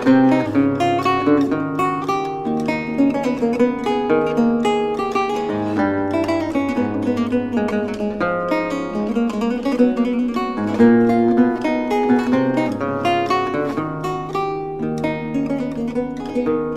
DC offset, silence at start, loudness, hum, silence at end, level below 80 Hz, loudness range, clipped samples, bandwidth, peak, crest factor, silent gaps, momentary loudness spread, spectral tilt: under 0.1%; 0 s; -19 LUFS; none; 0 s; -46 dBFS; 4 LU; under 0.1%; 12.5 kHz; -4 dBFS; 16 dB; none; 7 LU; -7 dB/octave